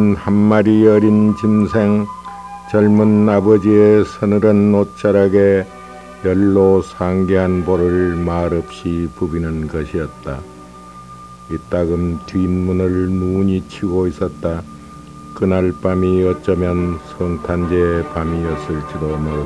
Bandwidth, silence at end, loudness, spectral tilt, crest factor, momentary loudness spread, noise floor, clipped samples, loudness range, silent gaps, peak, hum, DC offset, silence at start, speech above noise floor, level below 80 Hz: 11 kHz; 0 s; -15 LUFS; -9 dB/octave; 16 dB; 16 LU; -36 dBFS; under 0.1%; 9 LU; none; 0 dBFS; none; 0.1%; 0 s; 22 dB; -36 dBFS